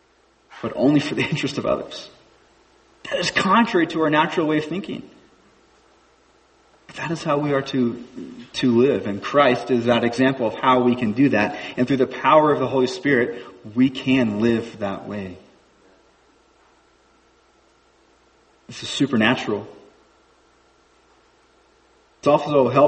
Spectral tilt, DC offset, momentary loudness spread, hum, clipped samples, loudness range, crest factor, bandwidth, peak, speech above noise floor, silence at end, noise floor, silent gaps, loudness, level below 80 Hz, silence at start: -6 dB/octave; under 0.1%; 16 LU; none; under 0.1%; 9 LU; 20 dB; 8.6 kHz; -2 dBFS; 39 dB; 0 s; -59 dBFS; none; -20 LUFS; -58 dBFS; 0.5 s